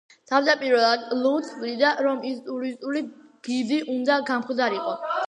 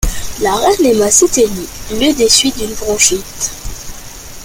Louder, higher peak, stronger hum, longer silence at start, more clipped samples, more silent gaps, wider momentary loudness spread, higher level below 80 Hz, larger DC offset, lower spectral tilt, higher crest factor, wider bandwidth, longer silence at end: second, -24 LUFS vs -12 LUFS; second, -6 dBFS vs 0 dBFS; neither; first, 0.3 s vs 0 s; neither; neither; second, 10 LU vs 19 LU; second, -80 dBFS vs -28 dBFS; neither; first, -3.5 dB/octave vs -2 dB/octave; about the same, 18 dB vs 14 dB; second, 10 kHz vs over 20 kHz; about the same, 0.05 s vs 0 s